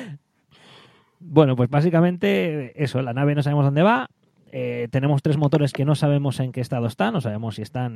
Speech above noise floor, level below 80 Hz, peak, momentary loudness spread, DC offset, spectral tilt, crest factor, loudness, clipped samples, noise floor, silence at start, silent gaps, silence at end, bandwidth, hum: 36 dB; -60 dBFS; -2 dBFS; 11 LU; under 0.1%; -8 dB/octave; 20 dB; -21 LUFS; under 0.1%; -56 dBFS; 0 s; none; 0 s; 12.5 kHz; none